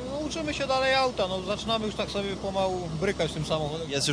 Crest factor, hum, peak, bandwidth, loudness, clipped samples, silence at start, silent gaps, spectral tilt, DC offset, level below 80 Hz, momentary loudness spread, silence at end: 18 dB; none; -10 dBFS; 11 kHz; -28 LUFS; under 0.1%; 0 s; none; -4 dB/octave; under 0.1%; -46 dBFS; 7 LU; 0 s